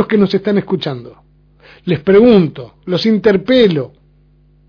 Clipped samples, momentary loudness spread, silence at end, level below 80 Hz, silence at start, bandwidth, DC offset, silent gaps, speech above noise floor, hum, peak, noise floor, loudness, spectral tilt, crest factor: under 0.1%; 18 LU; 0.8 s; -46 dBFS; 0 s; 5.4 kHz; under 0.1%; none; 37 dB; 50 Hz at -40 dBFS; 0 dBFS; -49 dBFS; -13 LUFS; -8 dB/octave; 14 dB